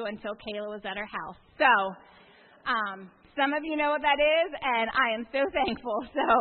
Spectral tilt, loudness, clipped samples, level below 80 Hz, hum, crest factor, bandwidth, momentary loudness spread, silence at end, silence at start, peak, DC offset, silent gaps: -7.5 dB/octave; -27 LUFS; under 0.1%; -58 dBFS; none; 20 dB; 4.4 kHz; 14 LU; 0 s; 0 s; -8 dBFS; under 0.1%; none